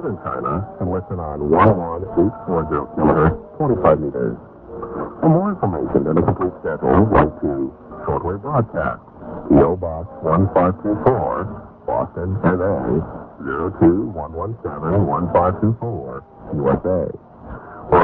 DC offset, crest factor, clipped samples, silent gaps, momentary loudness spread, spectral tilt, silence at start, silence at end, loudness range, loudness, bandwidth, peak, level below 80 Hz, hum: under 0.1%; 18 dB; under 0.1%; none; 15 LU; -12.5 dB/octave; 0 s; 0 s; 3 LU; -19 LUFS; 4.1 kHz; 0 dBFS; -36 dBFS; none